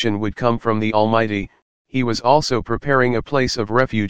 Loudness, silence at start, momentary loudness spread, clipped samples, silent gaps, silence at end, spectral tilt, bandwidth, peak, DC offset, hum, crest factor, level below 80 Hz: -19 LUFS; 0 s; 6 LU; under 0.1%; 1.62-1.85 s; 0 s; -5.5 dB/octave; 9.6 kHz; 0 dBFS; 2%; none; 18 dB; -42 dBFS